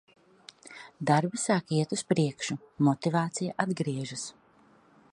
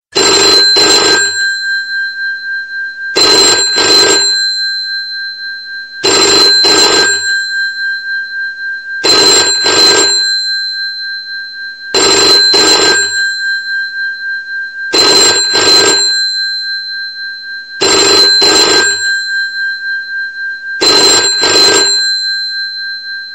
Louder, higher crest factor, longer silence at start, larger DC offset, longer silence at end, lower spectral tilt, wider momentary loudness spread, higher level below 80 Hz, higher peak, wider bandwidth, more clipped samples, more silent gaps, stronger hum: second, -29 LUFS vs -8 LUFS; first, 22 dB vs 10 dB; first, 0.65 s vs 0.15 s; second, under 0.1% vs 0.4%; first, 0.8 s vs 0 s; first, -5.5 dB/octave vs 0.5 dB/octave; about the same, 16 LU vs 14 LU; second, -72 dBFS vs -48 dBFS; second, -8 dBFS vs 0 dBFS; second, 11.5 kHz vs 17 kHz; neither; neither; neither